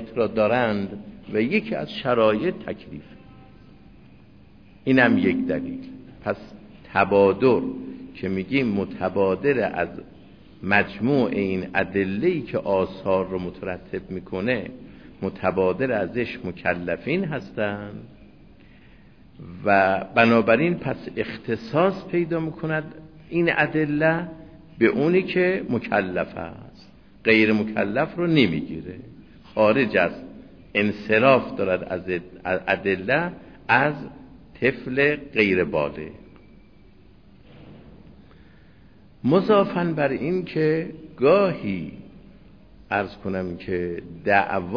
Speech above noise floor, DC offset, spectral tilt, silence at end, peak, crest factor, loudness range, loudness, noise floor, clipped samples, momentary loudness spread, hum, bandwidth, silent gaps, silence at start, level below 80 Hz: 29 dB; 0.2%; -8.5 dB/octave; 0 s; -2 dBFS; 20 dB; 5 LU; -23 LUFS; -52 dBFS; under 0.1%; 15 LU; none; 5.4 kHz; none; 0 s; -54 dBFS